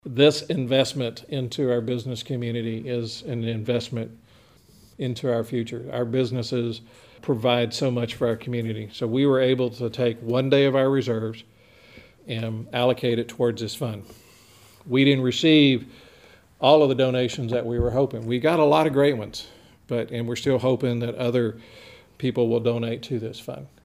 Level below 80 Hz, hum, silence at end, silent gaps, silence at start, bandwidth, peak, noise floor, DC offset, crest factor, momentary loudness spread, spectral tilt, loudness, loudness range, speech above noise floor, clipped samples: -52 dBFS; none; 0.2 s; none; 0.05 s; 15.5 kHz; -2 dBFS; -54 dBFS; under 0.1%; 22 dB; 12 LU; -6.5 dB/octave; -23 LUFS; 7 LU; 31 dB; under 0.1%